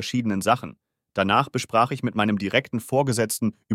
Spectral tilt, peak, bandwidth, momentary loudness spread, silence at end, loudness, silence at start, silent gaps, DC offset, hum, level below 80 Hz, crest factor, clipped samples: -5 dB/octave; -4 dBFS; 16 kHz; 5 LU; 0 s; -23 LUFS; 0 s; none; under 0.1%; none; -64 dBFS; 20 dB; under 0.1%